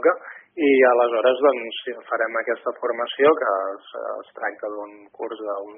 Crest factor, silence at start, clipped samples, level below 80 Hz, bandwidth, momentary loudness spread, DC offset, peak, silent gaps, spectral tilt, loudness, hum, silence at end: 16 dB; 0 s; under 0.1%; -74 dBFS; 3.7 kHz; 16 LU; under 0.1%; -6 dBFS; none; -1 dB/octave; -22 LUFS; none; 0 s